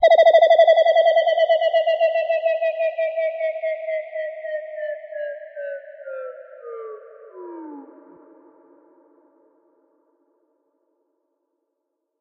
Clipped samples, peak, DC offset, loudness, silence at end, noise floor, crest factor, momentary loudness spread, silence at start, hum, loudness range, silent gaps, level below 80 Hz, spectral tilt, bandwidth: under 0.1%; -4 dBFS; under 0.1%; -19 LUFS; 4.35 s; -78 dBFS; 16 dB; 24 LU; 0 s; none; 23 LU; none; -86 dBFS; -1.5 dB/octave; 6.2 kHz